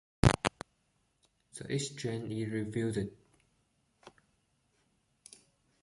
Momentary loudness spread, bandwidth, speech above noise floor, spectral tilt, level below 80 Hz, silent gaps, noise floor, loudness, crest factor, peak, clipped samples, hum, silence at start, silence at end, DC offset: 24 LU; 11.5 kHz; 40 dB; -5.5 dB/octave; -50 dBFS; none; -76 dBFS; -34 LUFS; 30 dB; -8 dBFS; under 0.1%; none; 0.25 s; 1.75 s; under 0.1%